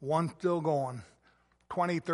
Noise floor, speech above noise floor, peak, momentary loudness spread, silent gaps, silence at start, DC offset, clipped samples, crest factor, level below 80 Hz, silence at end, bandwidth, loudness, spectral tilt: -68 dBFS; 37 dB; -14 dBFS; 9 LU; none; 0 s; under 0.1%; under 0.1%; 18 dB; -70 dBFS; 0 s; 11.5 kHz; -32 LUFS; -7.5 dB/octave